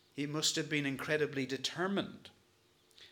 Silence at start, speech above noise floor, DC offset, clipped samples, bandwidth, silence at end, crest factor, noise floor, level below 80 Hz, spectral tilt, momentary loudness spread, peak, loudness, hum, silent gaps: 0.15 s; 34 dB; under 0.1%; under 0.1%; 19 kHz; 0.05 s; 18 dB; -70 dBFS; -78 dBFS; -3.5 dB/octave; 7 LU; -18 dBFS; -35 LUFS; none; none